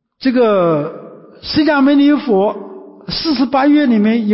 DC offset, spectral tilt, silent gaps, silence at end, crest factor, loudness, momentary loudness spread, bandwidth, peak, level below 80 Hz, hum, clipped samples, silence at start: under 0.1%; -10 dB/octave; none; 0 s; 10 dB; -13 LUFS; 18 LU; 5.8 kHz; -4 dBFS; -48 dBFS; none; under 0.1%; 0.2 s